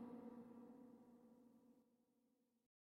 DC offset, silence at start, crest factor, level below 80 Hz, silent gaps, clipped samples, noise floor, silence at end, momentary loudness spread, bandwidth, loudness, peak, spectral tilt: under 0.1%; 0 s; 16 dB; under -90 dBFS; none; under 0.1%; -84 dBFS; 0.35 s; 11 LU; 5 kHz; -62 LUFS; -46 dBFS; -7.5 dB/octave